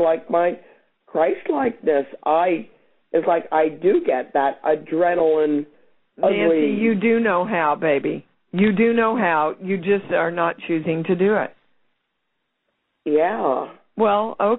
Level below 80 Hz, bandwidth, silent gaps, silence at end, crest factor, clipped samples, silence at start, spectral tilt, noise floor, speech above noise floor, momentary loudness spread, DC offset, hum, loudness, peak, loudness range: -62 dBFS; 4.1 kHz; none; 0 s; 16 dB; under 0.1%; 0 s; -5 dB/octave; -75 dBFS; 56 dB; 7 LU; under 0.1%; none; -20 LUFS; -4 dBFS; 4 LU